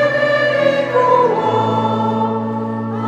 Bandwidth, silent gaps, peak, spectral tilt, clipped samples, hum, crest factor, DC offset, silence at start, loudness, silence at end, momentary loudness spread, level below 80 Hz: 9.4 kHz; none; -2 dBFS; -7 dB/octave; under 0.1%; none; 14 dB; under 0.1%; 0 s; -16 LUFS; 0 s; 8 LU; -60 dBFS